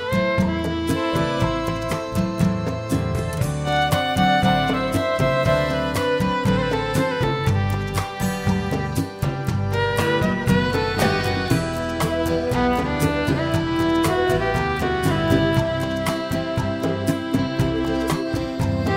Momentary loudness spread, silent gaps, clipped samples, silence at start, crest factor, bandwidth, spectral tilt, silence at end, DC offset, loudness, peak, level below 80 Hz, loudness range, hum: 5 LU; none; under 0.1%; 0 s; 16 dB; 16 kHz; -6 dB/octave; 0 s; under 0.1%; -21 LUFS; -6 dBFS; -36 dBFS; 3 LU; none